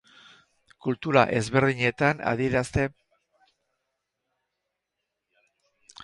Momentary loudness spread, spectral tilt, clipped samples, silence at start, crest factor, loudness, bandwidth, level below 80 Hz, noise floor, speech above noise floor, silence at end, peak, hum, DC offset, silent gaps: 10 LU; -6 dB/octave; under 0.1%; 0.85 s; 24 dB; -25 LUFS; 11.5 kHz; -52 dBFS; -83 dBFS; 59 dB; 3.15 s; -4 dBFS; none; under 0.1%; none